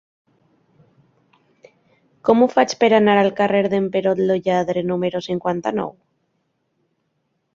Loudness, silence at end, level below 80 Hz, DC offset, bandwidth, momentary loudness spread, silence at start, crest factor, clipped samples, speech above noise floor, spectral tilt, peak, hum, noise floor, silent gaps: -18 LUFS; 1.65 s; -62 dBFS; under 0.1%; 7.6 kHz; 9 LU; 2.25 s; 20 dB; under 0.1%; 53 dB; -6 dB/octave; 0 dBFS; none; -71 dBFS; none